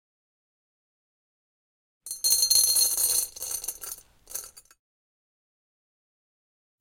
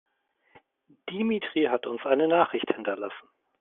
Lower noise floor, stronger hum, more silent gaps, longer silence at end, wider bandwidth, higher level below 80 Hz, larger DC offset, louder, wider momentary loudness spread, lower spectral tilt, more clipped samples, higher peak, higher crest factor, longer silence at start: first, under -90 dBFS vs -66 dBFS; neither; neither; first, 2.2 s vs 0.4 s; first, 17 kHz vs 4 kHz; first, -64 dBFS vs -74 dBFS; neither; first, -22 LUFS vs -27 LUFS; first, 20 LU vs 15 LU; second, 3 dB/octave vs -3 dB/octave; neither; about the same, -6 dBFS vs -6 dBFS; about the same, 26 dB vs 22 dB; first, 2.05 s vs 0.55 s